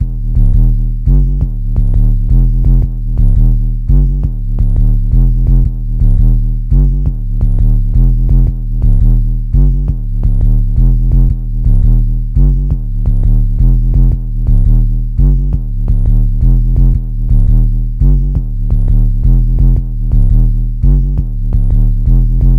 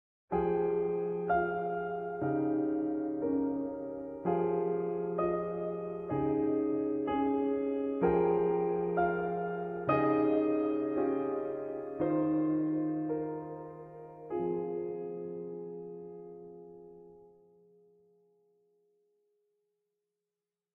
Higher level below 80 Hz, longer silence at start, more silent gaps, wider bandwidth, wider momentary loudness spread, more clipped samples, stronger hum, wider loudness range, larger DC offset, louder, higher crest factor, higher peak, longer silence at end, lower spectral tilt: first, -10 dBFS vs -62 dBFS; second, 0 s vs 0.3 s; neither; second, 1.1 kHz vs 4 kHz; second, 5 LU vs 14 LU; neither; neither; second, 0 LU vs 10 LU; neither; first, -14 LUFS vs -33 LUFS; second, 8 dB vs 18 dB; first, 0 dBFS vs -16 dBFS; second, 0 s vs 3.55 s; about the same, -11.5 dB/octave vs -11 dB/octave